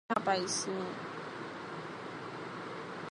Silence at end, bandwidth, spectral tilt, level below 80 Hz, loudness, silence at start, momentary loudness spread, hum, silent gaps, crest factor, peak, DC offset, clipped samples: 0 s; 11.5 kHz; -3 dB/octave; -76 dBFS; -38 LUFS; 0.1 s; 11 LU; none; none; 24 dB; -14 dBFS; under 0.1%; under 0.1%